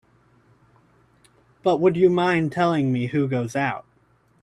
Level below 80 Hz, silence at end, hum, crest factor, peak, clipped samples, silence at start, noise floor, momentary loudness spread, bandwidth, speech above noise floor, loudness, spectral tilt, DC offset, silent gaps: -62 dBFS; 0.6 s; none; 18 dB; -6 dBFS; under 0.1%; 1.65 s; -61 dBFS; 8 LU; 10.5 kHz; 40 dB; -21 LUFS; -7 dB/octave; under 0.1%; none